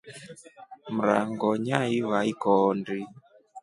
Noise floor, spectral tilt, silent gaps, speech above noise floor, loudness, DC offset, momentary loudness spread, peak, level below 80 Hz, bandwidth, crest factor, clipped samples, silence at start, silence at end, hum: -49 dBFS; -6.5 dB/octave; none; 23 dB; -26 LUFS; under 0.1%; 21 LU; -6 dBFS; -70 dBFS; 11.5 kHz; 22 dB; under 0.1%; 0.05 s; 0.05 s; none